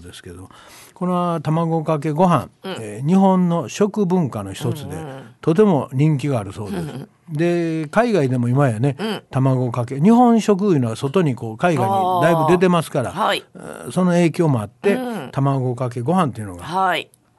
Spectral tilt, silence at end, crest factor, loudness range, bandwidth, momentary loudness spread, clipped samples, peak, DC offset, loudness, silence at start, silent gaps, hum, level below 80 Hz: -7 dB/octave; 0.35 s; 14 dB; 4 LU; 12.5 kHz; 13 LU; under 0.1%; -4 dBFS; under 0.1%; -19 LUFS; 0 s; none; none; -52 dBFS